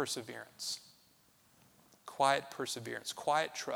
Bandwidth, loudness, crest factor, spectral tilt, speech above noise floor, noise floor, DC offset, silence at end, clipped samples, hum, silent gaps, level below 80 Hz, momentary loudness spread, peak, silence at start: over 20 kHz; -36 LUFS; 24 dB; -2 dB/octave; 32 dB; -68 dBFS; under 0.1%; 0 s; under 0.1%; none; none; -82 dBFS; 15 LU; -14 dBFS; 0 s